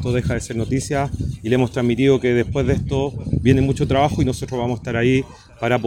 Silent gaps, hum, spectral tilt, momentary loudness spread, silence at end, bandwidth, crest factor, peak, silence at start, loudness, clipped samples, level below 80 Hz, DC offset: none; none; -6.5 dB/octave; 7 LU; 0 s; 13 kHz; 18 dB; -2 dBFS; 0 s; -20 LUFS; under 0.1%; -34 dBFS; under 0.1%